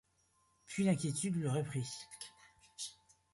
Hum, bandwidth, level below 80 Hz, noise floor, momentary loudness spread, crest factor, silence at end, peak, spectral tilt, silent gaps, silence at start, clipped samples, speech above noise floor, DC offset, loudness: none; 11.5 kHz; -72 dBFS; -75 dBFS; 16 LU; 20 dB; 0.4 s; -20 dBFS; -5.5 dB/octave; none; 0.7 s; under 0.1%; 39 dB; under 0.1%; -38 LUFS